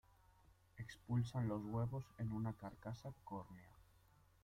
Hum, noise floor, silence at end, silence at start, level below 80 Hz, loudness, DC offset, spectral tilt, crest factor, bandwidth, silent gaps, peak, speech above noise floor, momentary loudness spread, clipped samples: none; -71 dBFS; 0.6 s; 0.75 s; -68 dBFS; -46 LUFS; under 0.1%; -8 dB/octave; 18 dB; 10.5 kHz; none; -30 dBFS; 27 dB; 14 LU; under 0.1%